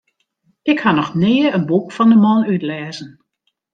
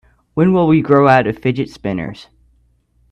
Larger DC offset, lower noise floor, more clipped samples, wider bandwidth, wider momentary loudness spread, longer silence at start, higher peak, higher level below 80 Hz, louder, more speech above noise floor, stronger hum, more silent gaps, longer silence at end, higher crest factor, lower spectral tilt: neither; first, -63 dBFS vs -57 dBFS; neither; second, 7.6 kHz vs 8.6 kHz; about the same, 14 LU vs 14 LU; first, 0.65 s vs 0.35 s; about the same, 0 dBFS vs 0 dBFS; second, -60 dBFS vs -48 dBFS; about the same, -15 LUFS vs -14 LUFS; first, 49 dB vs 43 dB; neither; neither; second, 0.65 s vs 0.9 s; about the same, 16 dB vs 16 dB; about the same, -7.5 dB/octave vs -8.5 dB/octave